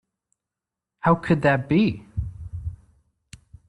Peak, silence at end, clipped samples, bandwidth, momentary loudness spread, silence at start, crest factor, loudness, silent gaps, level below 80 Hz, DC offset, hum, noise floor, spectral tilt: -4 dBFS; 0.95 s; under 0.1%; 11 kHz; 15 LU; 1.05 s; 20 dB; -22 LUFS; none; -44 dBFS; under 0.1%; none; -87 dBFS; -8 dB/octave